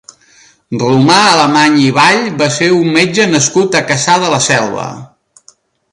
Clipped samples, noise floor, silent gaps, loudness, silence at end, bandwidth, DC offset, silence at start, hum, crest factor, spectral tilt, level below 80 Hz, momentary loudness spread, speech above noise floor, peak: under 0.1%; -47 dBFS; none; -9 LUFS; 0.85 s; 11.5 kHz; under 0.1%; 0.7 s; none; 12 dB; -3.5 dB/octave; -52 dBFS; 9 LU; 38 dB; 0 dBFS